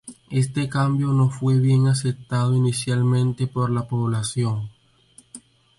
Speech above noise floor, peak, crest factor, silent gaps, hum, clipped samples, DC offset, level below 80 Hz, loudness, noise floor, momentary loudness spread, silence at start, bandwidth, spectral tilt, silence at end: 34 dB; -8 dBFS; 14 dB; none; none; under 0.1%; under 0.1%; -56 dBFS; -22 LUFS; -54 dBFS; 6 LU; 0.05 s; 11.5 kHz; -6.5 dB/octave; 0.4 s